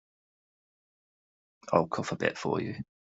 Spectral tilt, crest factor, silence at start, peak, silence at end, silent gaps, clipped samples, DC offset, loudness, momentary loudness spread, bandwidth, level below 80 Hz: -6 dB/octave; 26 dB; 1.65 s; -8 dBFS; 0.3 s; none; under 0.1%; under 0.1%; -31 LUFS; 9 LU; 8 kHz; -68 dBFS